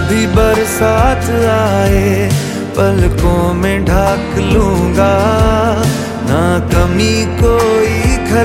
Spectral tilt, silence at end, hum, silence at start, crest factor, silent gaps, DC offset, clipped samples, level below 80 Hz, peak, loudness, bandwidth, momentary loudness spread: -6 dB/octave; 0 s; none; 0 s; 10 dB; none; under 0.1%; under 0.1%; -20 dBFS; 0 dBFS; -12 LUFS; 16.5 kHz; 3 LU